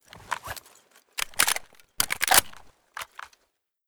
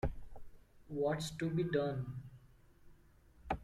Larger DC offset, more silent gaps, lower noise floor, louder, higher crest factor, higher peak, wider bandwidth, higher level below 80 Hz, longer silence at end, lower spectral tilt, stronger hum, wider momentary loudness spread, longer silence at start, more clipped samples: neither; neither; first, -74 dBFS vs -64 dBFS; first, -24 LUFS vs -39 LUFS; first, 28 dB vs 18 dB; first, -2 dBFS vs -22 dBFS; first, over 20 kHz vs 15 kHz; about the same, -58 dBFS vs -54 dBFS; first, 0.6 s vs 0 s; second, 1 dB/octave vs -6.5 dB/octave; neither; about the same, 21 LU vs 22 LU; about the same, 0.15 s vs 0.05 s; neither